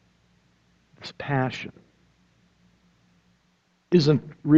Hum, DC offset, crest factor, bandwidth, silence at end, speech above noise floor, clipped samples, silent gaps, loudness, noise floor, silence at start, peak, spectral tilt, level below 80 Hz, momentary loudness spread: none; under 0.1%; 22 dB; 7.6 kHz; 0 s; 46 dB; under 0.1%; none; -24 LUFS; -67 dBFS; 1 s; -4 dBFS; -7.5 dB/octave; -62 dBFS; 21 LU